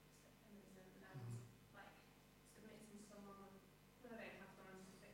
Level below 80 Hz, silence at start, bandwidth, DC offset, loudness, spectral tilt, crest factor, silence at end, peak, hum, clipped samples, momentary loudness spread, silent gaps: -78 dBFS; 0 s; 16.5 kHz; under 0.1%; -61 LUFS; -5.5 dB/octave; 18 dB; 0 s; -44 dBFS; 50 Hz at -75 dBFS; under 0.1%; 12 LU; none